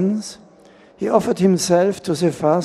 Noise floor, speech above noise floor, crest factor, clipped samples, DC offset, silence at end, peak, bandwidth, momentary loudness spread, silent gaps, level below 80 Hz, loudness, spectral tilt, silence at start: -48 dBFS; 30 dB; 18 dB; under 0.1%; under 0.1%; 0 s; 0 dBFS; 13 kHz; 11 LU; none; -56 dBFS; -18 LUFS; -6 dB/octave; 0 s